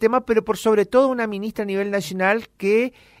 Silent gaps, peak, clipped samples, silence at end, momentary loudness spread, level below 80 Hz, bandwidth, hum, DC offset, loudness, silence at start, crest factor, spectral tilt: none; -4 dBFS; under 0.1%; 0.3 s; 8 LU; -56 dBFS; 16 kHz; none; under 0.1%; -21 LUFS; 0 s; 16 dB; -5.5 dB/octave